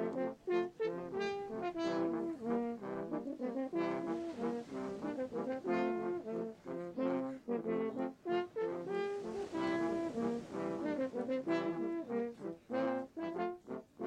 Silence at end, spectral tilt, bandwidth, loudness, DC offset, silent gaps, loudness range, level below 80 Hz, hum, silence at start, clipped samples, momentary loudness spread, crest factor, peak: 0 s; -7 dB/octave; 9.6 kHz; -39 LUFS; under 0.1%; none; 1 LU; -74 dBFS; none; 0 s; under 0.1%; 6 LU; 16 dB; -24 dBFS